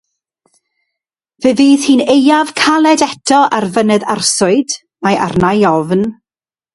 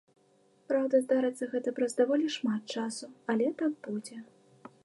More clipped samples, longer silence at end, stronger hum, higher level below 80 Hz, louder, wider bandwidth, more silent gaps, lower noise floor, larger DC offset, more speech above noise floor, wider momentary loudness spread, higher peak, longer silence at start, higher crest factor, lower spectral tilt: neither; first, 0.6 s vs 0.15 s; neither; first, -48 dBFS vs -86 dBFS; first, -11 LUFS vs -31 LUFS; about the same, 11.5 kHz vs 11.5 kHz; neither; first, under -90 dBFS vs -66 dBFS; neither; first, over 79 dB vs 36 dB; second, 6 LU vs 12 LU; first, 0 dBFS vs -14 dBFS; first, 1.4 s vs 0.7 s; about the same, 12 dB vs 16 dB; about the same, -4 dB/octave vs -4.5 dB/octave